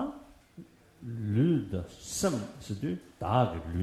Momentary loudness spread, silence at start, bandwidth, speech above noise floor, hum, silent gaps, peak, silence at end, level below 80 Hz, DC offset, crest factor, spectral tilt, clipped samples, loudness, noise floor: 13 LU; 0 s; 14 kHz; 21 dB; none; none; -12 dBFS; 0 s; -52 dBFS; under 0.1%; 20 dB; -6 dB/octave; under 0.1%; -32 LUFS; -53 dBFS